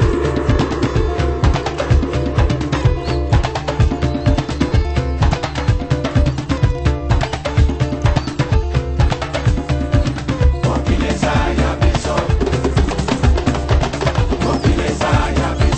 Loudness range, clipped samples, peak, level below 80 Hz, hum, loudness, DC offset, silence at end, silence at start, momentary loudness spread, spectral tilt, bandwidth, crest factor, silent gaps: 1 LU; under 0.1%; 0 dBFS; -20 dBFS; none; -17 LUFS; under 0.1%; 0 s; 0 s; 2 LU; -6.5 dB/octave; 8.6 kHz; 14 dB; none